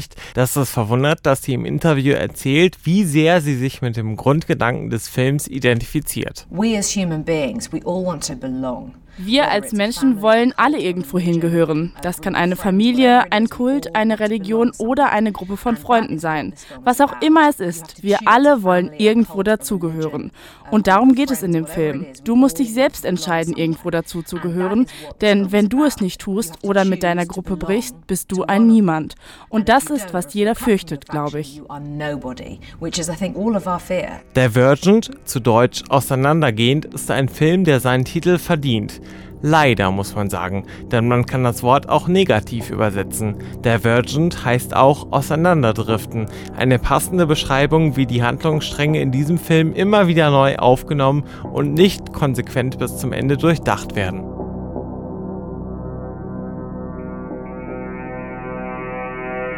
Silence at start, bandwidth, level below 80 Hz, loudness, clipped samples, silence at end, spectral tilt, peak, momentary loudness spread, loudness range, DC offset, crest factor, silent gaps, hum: 0 s; 18 kHz; -40 dBFS; -18 LUFS; under 0.1%; 0 s; -5.5 dB/octave; 0 dBFS; 14 LU; 6 LU; under 0.1%; 18 dB; none; none